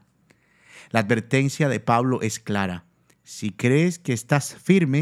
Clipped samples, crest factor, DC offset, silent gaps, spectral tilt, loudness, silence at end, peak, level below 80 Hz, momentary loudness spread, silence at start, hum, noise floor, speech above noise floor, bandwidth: under 0.1%; 22 dB; under 0.1%; none; -6 dB/octave; -23 LUFS; 0 s; -2 dBFS; -66 dBFS; 10 LU; 0.75 s; none; -61 dBFS; 39 dB; 14.5 kHz